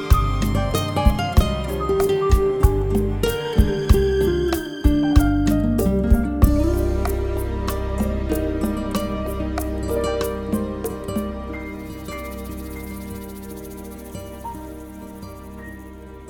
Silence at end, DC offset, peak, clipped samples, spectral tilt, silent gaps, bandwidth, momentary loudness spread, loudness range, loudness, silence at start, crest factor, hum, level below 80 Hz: 0 s; under 0.1%; 0 dBFS; under 0.1%; -6.5 dB/octave; none; 20 kHz; 17 LU; 14 LU; -22 LUFS; 0 s; 20 dB; none; -24 dBFS